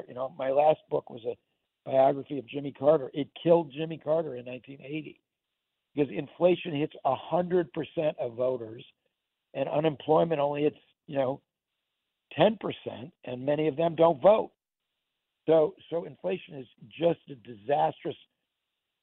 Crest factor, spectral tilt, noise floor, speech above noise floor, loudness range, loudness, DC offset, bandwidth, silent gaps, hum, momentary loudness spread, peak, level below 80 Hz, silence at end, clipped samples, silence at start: 20 dB; -5.5 dB/octave; -86 dBFS; 58 dB; 4 LU; -28 LUFS; under 0.1%; 4.1 kHz; none; none; 16 LU; -10 dBFS; -72 dBFS; 0.9 s; under 0.1%; 0.1 s